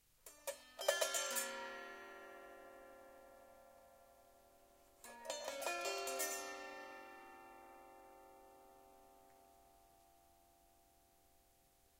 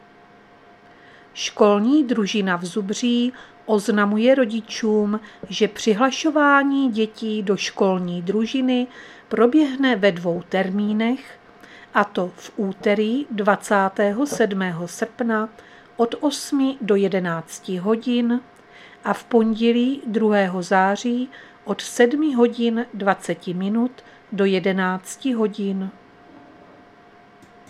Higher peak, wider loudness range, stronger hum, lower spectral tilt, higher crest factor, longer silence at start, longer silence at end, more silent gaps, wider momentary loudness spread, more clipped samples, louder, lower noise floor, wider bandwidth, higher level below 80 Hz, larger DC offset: second, -20 dBFS vs -2 dBFS; first, 21 LU vs 3 LU; neither; second, 0.5 dB/octave vs -5.5 dB/octave; first, 30 dB vs 20 dB; second, 0.25 s vs 1.35 s; second, 1.2 s vs 1.8 s; neither; first, 26 LU vs 10 LU; neither; second, -44 LUFS vs -21 LUFS; first, -73 dBFS vs -49 dBFS; first, 16 kHz vs 13.5 kHz; second, -80 dBFS vs -64 dBFS; neither